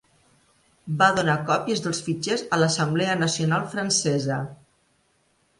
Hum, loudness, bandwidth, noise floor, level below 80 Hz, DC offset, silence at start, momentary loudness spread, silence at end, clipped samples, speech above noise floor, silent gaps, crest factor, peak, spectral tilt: none; -23 LUFS; 11.5 kHz; -66 dBFS; -62 dBFS; under 0.1%; 0.85 s; 9 LU; 1.05 s; under 0.1%; 43 dB; none; 18 dB; -6 dBFS; -4 dB/octave